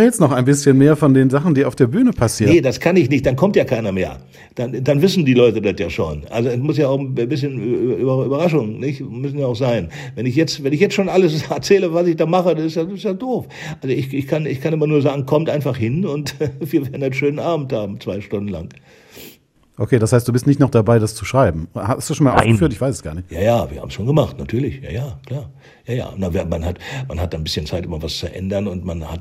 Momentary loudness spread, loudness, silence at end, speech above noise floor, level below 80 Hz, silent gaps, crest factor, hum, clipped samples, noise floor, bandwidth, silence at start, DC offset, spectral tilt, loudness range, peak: 12 LU; -18 LUFS; 0 s; 30 dB; -40 dBFS; none; 18 dB; none; under 0.1%; -47 dBFS; 16 kHz; 0 s; under 0.1%; -6.5 dB/octave; 7 LU; 0 dBFS